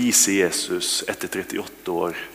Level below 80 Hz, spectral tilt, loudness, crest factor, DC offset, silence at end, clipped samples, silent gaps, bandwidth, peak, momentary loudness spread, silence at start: -60 dBFS; -1.5 dB/octave; -22 LUFS; 20 dB; under 0.1%; 0 s; under 0.1%; none; 16 kHz; -4 dBFS; 13 LU; 0 s